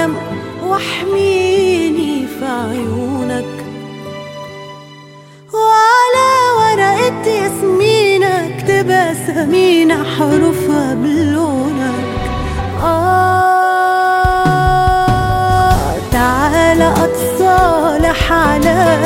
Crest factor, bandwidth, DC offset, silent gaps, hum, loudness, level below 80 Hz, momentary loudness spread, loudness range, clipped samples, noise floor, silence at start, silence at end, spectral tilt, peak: 12 dB; 16.5 kHz; under 0.1%; none; none; -13 LUFS; -28 dBFS; 10 LU; 5 LU; under 0.1%; -37 dBFS; 0 s; 0 s; -5.5 dB/octave; 0 dBFS